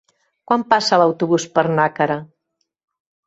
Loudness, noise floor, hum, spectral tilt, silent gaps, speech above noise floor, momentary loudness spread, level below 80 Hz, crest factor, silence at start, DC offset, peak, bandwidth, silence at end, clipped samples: -17 LUFS; -74 dBFS; none; -5 dB/octave; none; 57 dB; 6 LU; -64 dBFS; 18 dB; 0.5 s; under 0.1%; -2 dBFS; 8.2 kHz; 1 s; under 0.1%